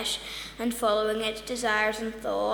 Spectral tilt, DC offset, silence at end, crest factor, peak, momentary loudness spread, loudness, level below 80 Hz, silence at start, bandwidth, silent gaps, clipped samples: -2.5 dB/octave; under 0.1%; 0 s; 18 dB; -12 dBFS; 7 LU; -28 LUFS; -54 dBFS; 0 s; over 20 kHz; none; under 0.1%